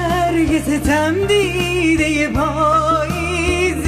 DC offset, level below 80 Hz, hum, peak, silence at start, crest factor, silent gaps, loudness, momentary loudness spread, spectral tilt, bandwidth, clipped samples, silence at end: under 0.1%; -30 dBFS; none; -6 dBFS; 0 s; 10 dB; none; -16 LUFS; 3 LU; -5 dB/octave; 15.5 kHz; under 0.1%; 0 s